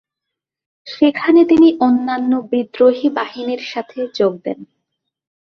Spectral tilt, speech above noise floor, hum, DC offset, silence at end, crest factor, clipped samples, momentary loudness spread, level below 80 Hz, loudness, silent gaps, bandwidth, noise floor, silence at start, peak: -6.5 dB/octave; 67 dB; none; under 0.1%; 0.95 s; 14 dB; under 0.1%; 15 LU; -58 dBFS; -15 LUFS; none; 6.4 kHz; -82 dBFS; 0.85 s; -2 dBFS